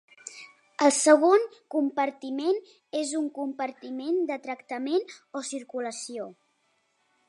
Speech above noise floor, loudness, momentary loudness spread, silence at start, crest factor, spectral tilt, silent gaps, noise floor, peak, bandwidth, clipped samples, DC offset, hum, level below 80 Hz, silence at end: 45 dB; -27 LUFS; 19 LU; 0.25 s; 22 dB; -2 dB/octave; none; -72 dBFS; -6 dBFS; 11.5 kHz; under 0.1%; under 0.1%; none; -88 dBFS; 0.95 s